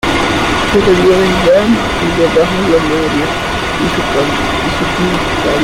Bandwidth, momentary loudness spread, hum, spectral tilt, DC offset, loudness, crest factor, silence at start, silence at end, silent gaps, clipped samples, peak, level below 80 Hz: 16.5 kHz; 5 LU; none; -5 dB/octave; under 0.1%; -12 LUFS; 10 dB; 0.05 s; 0 s; none; under 0.1%; -2 dBFS; -28 dBFS